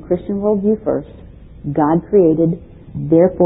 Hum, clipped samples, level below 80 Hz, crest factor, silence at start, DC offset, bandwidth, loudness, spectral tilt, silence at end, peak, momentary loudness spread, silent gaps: none; under 0.1%; -42 dBFS; 14 dB; 0 s; under 0.1%; 3.9 kHz; -16 LUFS; -14.5 dB/octave; 0 s; -2 dBFS; 15 LU; none